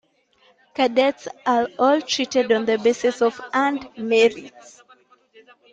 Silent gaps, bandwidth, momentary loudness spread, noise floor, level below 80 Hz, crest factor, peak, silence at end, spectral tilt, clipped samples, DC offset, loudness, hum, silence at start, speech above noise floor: none; 8.8 kHz; 6 LU; -59 dBFS; -66 dBFS; 16 dB; -6 dBFS; 1.25 s; -3 dB/octave; under 0.1%; under 0.1%; -20 LUFS; none; 0.8 s; 39 dB